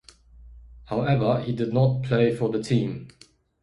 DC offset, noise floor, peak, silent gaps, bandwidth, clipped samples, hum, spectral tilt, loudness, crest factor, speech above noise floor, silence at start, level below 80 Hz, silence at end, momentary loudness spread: under 0.1%; -49 dBFS; -8 dBFS; none; 11 kHz; under 0.1%; none; -8 dB/octave; -24 LUFS; 16 dB; 26 dB; 0.4 s; -50 dBFS; 0.55 s; 8 LU